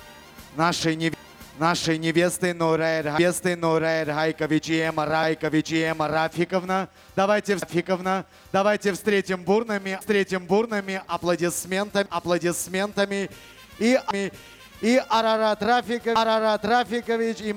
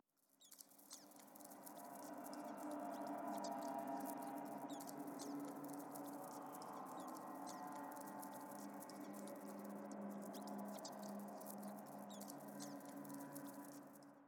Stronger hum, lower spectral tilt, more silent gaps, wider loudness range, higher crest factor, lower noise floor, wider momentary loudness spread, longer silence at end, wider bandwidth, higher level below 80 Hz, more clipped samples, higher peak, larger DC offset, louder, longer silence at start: neither; about the same, -4.5 dB/octave vs -4.5 dB/octave; neither; about the same, 2 LU vs 3 LU; about the same, 16 dB vs 18 dB; second, -45 dBFS vs -73 dBFS; second, 6 LU vs 10 LU; about the same, 0 s vs 0 s; about the same, 19 kHz vs 19.5 kHz; first, -58 dBFS vs under -90 dBFS; neither; first, -6 dBFS vs -34 dBFS; neither; first, -24 LUFS vs -52 LUFS; second, 0 s vs 0.4 s